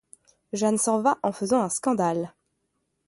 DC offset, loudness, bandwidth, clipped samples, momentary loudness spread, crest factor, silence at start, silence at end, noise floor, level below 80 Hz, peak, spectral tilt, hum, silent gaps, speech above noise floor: under 0.1%; -25 LUFS; 11.5 kHz; under 0.1%; 9 LU; 18 dB; 0.55 s; 0.8 s; -76 dBFS; -70 dBFS; -8 dBFS; -5 dB/octave; none; none; 52 dB